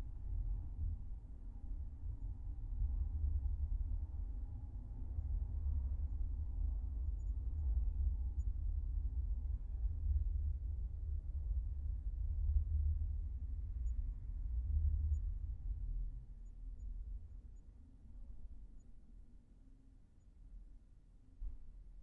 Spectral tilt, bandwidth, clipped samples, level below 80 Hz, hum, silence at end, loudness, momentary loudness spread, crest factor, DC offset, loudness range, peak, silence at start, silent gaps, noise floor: -12.5 dB/octave; 1.2 kHz; under 0.1%; -42 dBFS; none; 0 s; -44 LUFS; 19 LU; 16 dB; under 0.1%; 17 LU; -24 dBFS; 0 s; none; -62 dBFS